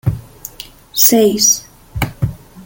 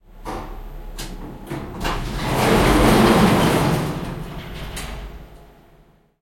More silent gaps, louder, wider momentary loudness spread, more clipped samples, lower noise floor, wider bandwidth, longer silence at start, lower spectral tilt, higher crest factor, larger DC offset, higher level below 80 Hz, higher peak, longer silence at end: neither; first, -13 LUFS vs -18 LUFS; about the same, 22 LU vs 22 LU; neither; second, -36 dBFS vs -53 dBFS; about the same, 17 kHz vs 16.5 kHz; about the same, 0.05 s vs 0.15 s; second, -3.5 dB/octave vs -5.5 dB/octave; about the same, 16 dB vs 20 dB; neither; second, -36 dBFS vs -30 dBFS; about the same, 0 dBFS vs -2 dBFS; second, 0.05 s vs 0.75 s